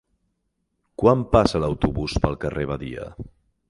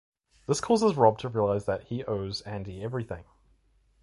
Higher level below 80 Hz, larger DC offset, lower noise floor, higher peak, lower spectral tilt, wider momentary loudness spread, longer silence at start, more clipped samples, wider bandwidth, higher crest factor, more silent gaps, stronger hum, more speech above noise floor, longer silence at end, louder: first, -36 dBFS vs -54 dBFS; neither; first, -74 dBFS vs -65 dBFS; first, 0 dBFS vs -6 dBFS; about the same, -7 dB/octave vs -6 dB/octave; first, 21 LU vs 15 LU; first, 1 s vs 0.5 s; neither; about the same, 11.5 kHz vs 11.5 kHz; about the same, 22 dB vs 22 dB; neither; neither; first, 53 dB vs 38 dB; second, 0.4 s vs 0.8 s; first, -22 LUFS vs -28 LUFS